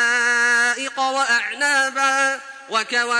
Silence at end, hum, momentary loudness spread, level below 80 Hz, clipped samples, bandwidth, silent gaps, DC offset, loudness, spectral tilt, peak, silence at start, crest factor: 0 s; none; 7 LU; -72 dBFS; under 0.1%; 10.5 kHz; none; under 0.1%; -18 LUFS; 1 dB/octave; -6 dBFS; 0 s; 14 dB